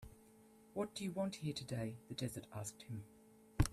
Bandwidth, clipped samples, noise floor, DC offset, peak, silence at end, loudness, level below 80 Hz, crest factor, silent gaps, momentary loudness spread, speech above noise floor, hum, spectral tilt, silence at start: 15 kHz; under 0.1%; -65 dBFS; under 0.1%; -18 dBFS; 0 s; -45 LUFS; -54 dBFS; 26 dB; none; 22 LU; 21 dB; none; -5.5 dB/octave; 0 s